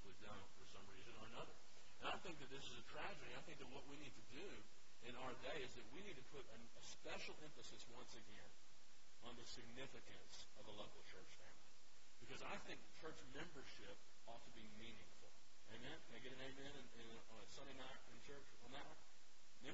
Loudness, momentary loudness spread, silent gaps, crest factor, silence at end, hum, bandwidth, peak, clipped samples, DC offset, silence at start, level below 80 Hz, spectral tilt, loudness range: -58 LUFS; 13 LU; none; 24 dB; 0 s; none; 7.6 kHz; -34 dBFS; under 0.1%; 0.4%; 0 s; -74 dBFS; -2.5 dB/octave; 5 LU